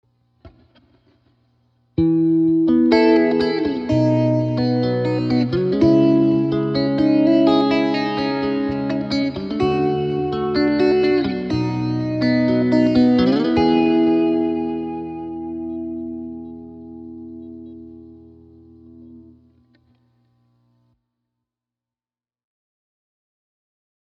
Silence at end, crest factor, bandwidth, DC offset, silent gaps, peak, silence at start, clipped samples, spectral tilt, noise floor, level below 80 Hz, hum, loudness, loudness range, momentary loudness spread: 4.85 s; 18 dB; 6.4 kHz; under 0.1%; none; -2 dBFS; 0.45 s; under 0.1%; -8.5 dB/octave; under -90 dBFS; -48 dBFS; 60 Hz at -55 dBFS; -18 LUFS; 14 LU; 16 LU